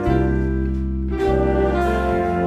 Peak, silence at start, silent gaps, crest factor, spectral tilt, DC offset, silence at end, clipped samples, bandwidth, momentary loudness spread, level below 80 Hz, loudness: -6 dBFS; 0 s; none; 12 dB; -8.5 dB/octave; under 0.1%; 0 s; under 0.1%; 8.6 kHz; 5 LU; -24 dBFS; -20 LUFS